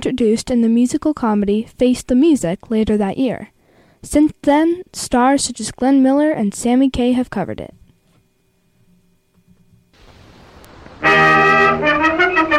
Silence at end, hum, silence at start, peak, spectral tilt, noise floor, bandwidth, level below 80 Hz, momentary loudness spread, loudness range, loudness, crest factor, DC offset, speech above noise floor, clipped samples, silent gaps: 0 s; none; 0 s; -2 dBFS; -4.5 dB/octave; -60 dBFS; 13.5 kHz; -42 dBFS; 10 LU; 7 LU; -15 LUFS; 14 dB; under 0.1%; 44 dB; under 0.1%; none